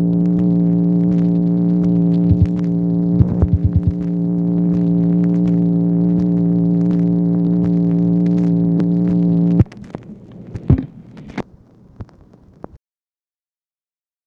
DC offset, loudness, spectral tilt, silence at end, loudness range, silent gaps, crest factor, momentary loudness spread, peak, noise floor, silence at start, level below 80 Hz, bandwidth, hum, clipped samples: under 0.1%; -16 LUFS; -12 dB/octave; 1.5 s; 11 LU; none; 16 dB; 13 LU; 0 dBFS; under -90 dBFS; 0 s; -34 dBFS; 2.6 kHz; none; under 0.1%